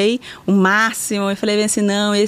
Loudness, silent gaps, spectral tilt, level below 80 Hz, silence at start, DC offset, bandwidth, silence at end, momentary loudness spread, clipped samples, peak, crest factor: -17 LUFS; none; -4 dB/octave; -58 dBFS; 0 s; under 0.1%; 15.5 kHz; 0 s; 6 LU; under 0.1%; -4 dBFS; 12 dB